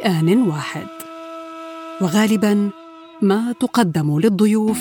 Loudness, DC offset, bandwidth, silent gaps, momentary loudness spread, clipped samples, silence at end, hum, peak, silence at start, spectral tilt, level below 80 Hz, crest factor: -18 LUFS; under 0.1%; 18 kHz; none; 17 LU; under 0.1%; 0 s; none; -2 dBFS; 0 s; -6 dB/octave; -64 dBFS; 16 dB